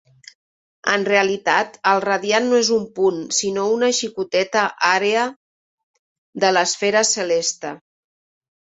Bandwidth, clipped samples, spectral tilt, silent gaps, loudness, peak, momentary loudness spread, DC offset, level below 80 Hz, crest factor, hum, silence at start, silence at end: 8.2 kHz; under 0.1%; -2 dB/octave; 5.36-6.33 s; -18 LUFS; 0 dBFS; 5 LU; under 0.1%; -66 dBFS; 20 dB; none; 0.85 s; 0.9 s